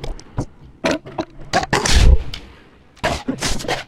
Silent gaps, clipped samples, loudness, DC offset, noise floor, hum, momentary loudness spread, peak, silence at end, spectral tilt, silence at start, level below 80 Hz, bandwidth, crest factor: none; under 0.1%; -20 LUFS; under 0.1%; -46 dBFS; none; 16 LU; 0 dBFS; 0.05 s; -4 dB/octave; 0 s; -22 dBFS; 15 kHz; 18 dB